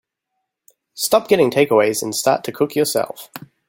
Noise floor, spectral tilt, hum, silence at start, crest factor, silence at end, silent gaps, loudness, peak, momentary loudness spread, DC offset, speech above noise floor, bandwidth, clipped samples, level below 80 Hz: -77 dBFS; -3.5 dB/octave; none; 0.95 s; 18 dB; 0.3 s; none; -17 LUFS; -2 dBFS; 11 LU; under 0.1%; 59 dB; 17 kHz; under 0.1%; -64 dBFS